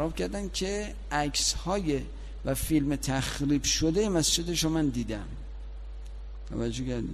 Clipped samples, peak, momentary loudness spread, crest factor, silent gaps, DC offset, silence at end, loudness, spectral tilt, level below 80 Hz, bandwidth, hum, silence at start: under 0.1%; -12 dBFS; 18 LU; 16 dB; none; under 0.1%; 0 s; -29 LUFS; -4 dB/octave; -38 dBFS; 15 kHz; none; 0 s